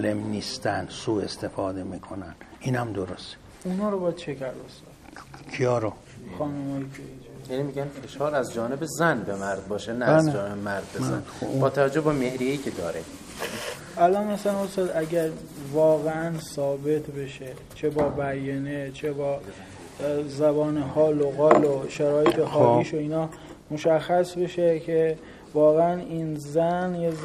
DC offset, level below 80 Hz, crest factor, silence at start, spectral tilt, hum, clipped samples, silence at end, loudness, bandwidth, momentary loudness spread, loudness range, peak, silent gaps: under 0.1%; -56 dBFS; 26 dB; 0 s; -6 dB/octave; none; under 0.1%; 0 s; -26 LUFS; 15 kHz; 16 LU; 9 LU; 0 dBFS; none